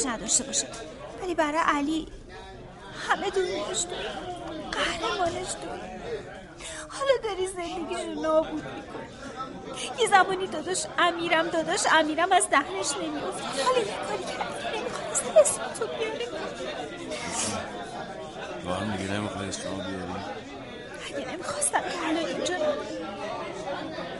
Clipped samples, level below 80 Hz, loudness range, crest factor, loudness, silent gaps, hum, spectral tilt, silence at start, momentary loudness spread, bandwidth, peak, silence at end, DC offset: under 0.1%; -54 dBFS; 8 LU; 22 dB; -28 LUFS; none; none; -2.5 dB/octave; 0 s; 16 LU; 11.5 kHz; -6 dBFS; 0 s; under 0.1%